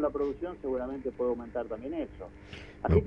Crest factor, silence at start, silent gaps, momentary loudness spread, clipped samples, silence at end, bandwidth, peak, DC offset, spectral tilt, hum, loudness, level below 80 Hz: 20 dB; 0 s; none; 14 LU; under 0.1%; 0 s; 6.6 kHz; -12 dBFS; under 0.1%; -9.5 dB/octave; none; -34 LUFS; -44 dBFS